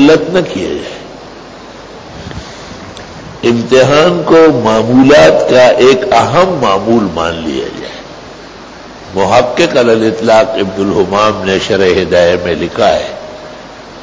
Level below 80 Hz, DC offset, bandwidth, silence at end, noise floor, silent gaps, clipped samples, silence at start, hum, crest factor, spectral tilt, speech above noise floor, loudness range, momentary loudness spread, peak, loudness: -38 dBFS; under 0.1%; 8 kHz; 0 s; -30 dBFS; none; 0.3%; 0 s; none; 10 dB; -5.5 dB/octave; 22 dB; 7 LU; 23 LU; 0 dBFS; -9 LUFS